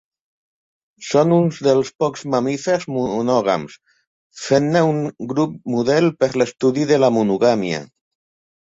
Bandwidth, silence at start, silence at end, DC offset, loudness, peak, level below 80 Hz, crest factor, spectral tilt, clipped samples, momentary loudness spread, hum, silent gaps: 8 kHz; 1 s; 0.8 s; under 0.1%; -18 LUFS; -2 dBFS; -60 dBFS; 16 dB; -6 dB/octave; under 0.1%; 8 LU; none; 1.95-1.99 s, 4.07-4.30 s